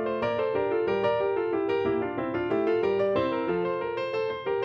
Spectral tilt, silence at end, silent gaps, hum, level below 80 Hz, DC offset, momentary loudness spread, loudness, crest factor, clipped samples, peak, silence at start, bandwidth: -8 dB/octave; 0 s; none; none; -58 dBFS; under 0.1%; 4 LU; -27 LUFS; 14 dB; under 0.1%; -12 dBFS; 0 s; 6.6 kHz